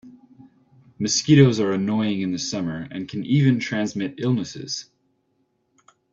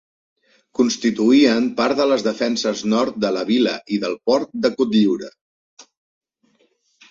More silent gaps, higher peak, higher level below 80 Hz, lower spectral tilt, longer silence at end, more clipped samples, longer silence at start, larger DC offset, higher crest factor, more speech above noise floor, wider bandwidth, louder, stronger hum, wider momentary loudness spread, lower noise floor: second, none vs 5.41-5.77 s; about the same, -2 dBFS vs -4 dBFS; about the same, -60 dBFS vs -62 dBFS; about the same, -5.5 dB/octave vs -4.5 dB/octave; about the same, 1.3 s vs 1.3 s; neither; second, 0.05 s vs 0.8 s; neither; about the same, 20 dB vs 16 dB; about the same, 48 dB vs 45 dB; about the same, 7.8 kHz vs 7.6 kHz; second, -22 LUFS vs -19 LUFS; neither; first, 15 LU vs 8 LU; first, -69 dBFS vs -63 dBFS